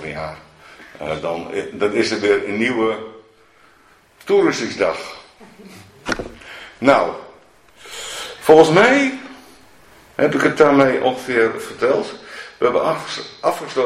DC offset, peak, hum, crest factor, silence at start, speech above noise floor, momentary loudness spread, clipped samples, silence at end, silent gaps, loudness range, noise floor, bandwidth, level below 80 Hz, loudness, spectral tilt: under 0.1%; 0 dBFS; none; 18 dB; 0 s; 35 dB; 21 LU; under 0.1%; 0 s; none; 8 LU; -52 dBFS; 15 kHz; -52 dBFS; -17 LUFS; -5 dB/octave